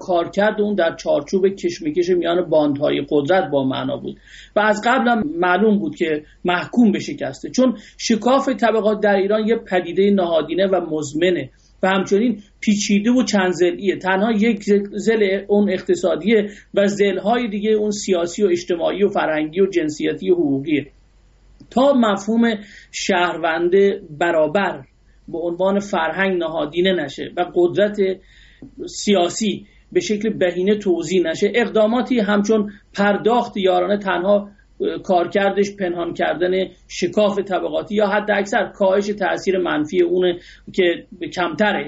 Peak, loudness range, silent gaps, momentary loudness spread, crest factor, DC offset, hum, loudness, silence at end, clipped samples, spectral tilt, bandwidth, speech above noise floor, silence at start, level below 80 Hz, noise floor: -4 dBFS; 2 LU; none; 7 LU; 14 dB; under 0.1%; none; -19 LUFS; 0 s; under 0.1%; -4 dB/octave; 8 kHz; 33 dB; 0 s; -52 dBFS; -52 dBFS